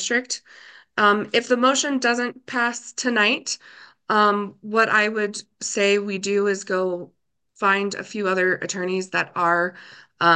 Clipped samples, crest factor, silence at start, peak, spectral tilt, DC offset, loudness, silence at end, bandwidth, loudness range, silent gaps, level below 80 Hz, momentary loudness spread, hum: under 0.1%; 18 dB; 0 s; -4 dBFS; -3 dB/octave; under 0.1%; -22 LUFS; 0 s; 10 kHz; 2 LU; none; -74 dBFS; 9 LU; none